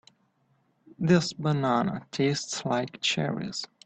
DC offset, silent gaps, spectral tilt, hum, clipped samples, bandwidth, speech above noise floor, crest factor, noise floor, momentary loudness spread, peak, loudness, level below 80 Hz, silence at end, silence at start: under 0.1%; none; -5 dB/octave; none; under 0.1%; 8.8 kHz; 42 dB; 20 dB; -69 dBFS; 8 LU; -10 dBFS; -27 LUFS; -64 dBFS; 0.2 s; 1 s